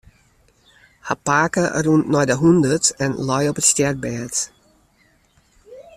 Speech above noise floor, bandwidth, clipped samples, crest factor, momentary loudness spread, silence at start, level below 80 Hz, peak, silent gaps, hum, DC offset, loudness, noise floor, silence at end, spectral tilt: 41 dB; 14.5 kHz; under 0.1%; 20 dB; 10 LU; 1.05 s; -52 dBFS; -2 dBFS; none; none; under 0.1%; -18 LUFS; -59 dBFS; 0.15 s; -4 dB/octave